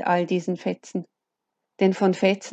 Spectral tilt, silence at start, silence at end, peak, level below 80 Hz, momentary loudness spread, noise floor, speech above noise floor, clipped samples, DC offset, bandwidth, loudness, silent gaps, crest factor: -6 dB/octave; 0 s; 0 s; -8 dBFS; -76 dBFS; 12 LU; -83 dBFS; 60 dB; under 0.1%; under 0.1%; 8.2 kHz; -24 LUFS; none; 16 dB